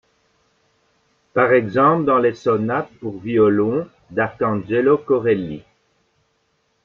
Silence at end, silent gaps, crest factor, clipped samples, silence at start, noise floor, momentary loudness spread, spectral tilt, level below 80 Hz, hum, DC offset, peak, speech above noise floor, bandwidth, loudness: 1.25 s; none; 18 dB; under 0.1%; 1.35 s; -66 dBFS; 11 LU; -8.5 dB/octave; -58 dBFS; none; under 0.1%; -2 dBFS; 49 dB; 6.8 kHz; -18 LUFS